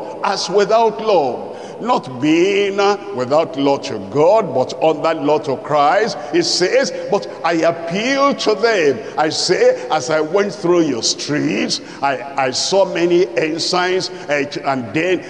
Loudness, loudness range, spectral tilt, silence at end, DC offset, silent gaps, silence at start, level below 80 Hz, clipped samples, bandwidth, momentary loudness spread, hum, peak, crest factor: -16 LUFS; 1 LU; -4 dB/octave; 0 s; 0.2%; none; 0 s; -64 dBFS; under 0.1%; 11 kHz; 6 LU; none; -4 dBFS; 12 dB